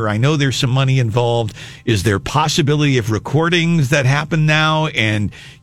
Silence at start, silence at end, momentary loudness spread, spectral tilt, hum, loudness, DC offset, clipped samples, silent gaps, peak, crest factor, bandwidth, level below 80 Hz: 0 s; 0.1 s; 5 LU; -5.5 dB/octave; none; -16 LUFS; under 0.1%; under 0.1%; none; 0 dBFS; 14 dB; 14 kHz; -42 dBFS